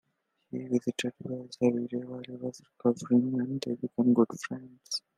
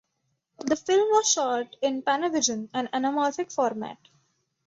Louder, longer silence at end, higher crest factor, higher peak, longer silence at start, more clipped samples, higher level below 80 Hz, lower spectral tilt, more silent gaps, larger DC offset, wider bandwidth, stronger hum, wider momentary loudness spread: second, -31 LUFS vs -25 LUFS; second, 0.2 s vs 0.7 s; about the same, 20 dB vs 18 dB; about the same, -10 dBFS vs -8 dBFS; about the same, 0.55 s vs 0.6 s; neither; second, -76 dBFS vs -70 dBFS; first, -6 dB/octave vs -2 dB/octave; neither; neither; first, 11.5 kHz vs 8 kHz; neither; first, 14 LU vs 9 LU